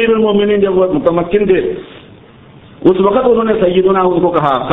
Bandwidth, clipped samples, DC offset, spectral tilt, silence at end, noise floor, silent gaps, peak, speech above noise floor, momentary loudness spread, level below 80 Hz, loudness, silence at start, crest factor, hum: 4 kHz; under 0.1%; under 0.1%; -9.5 dB/octave; 0 s; -39 dBFS; none; 0 dBFS; 28 dB; 3 LU; -40 dBFS; -12 LUFS; 0 s; 12 dB; none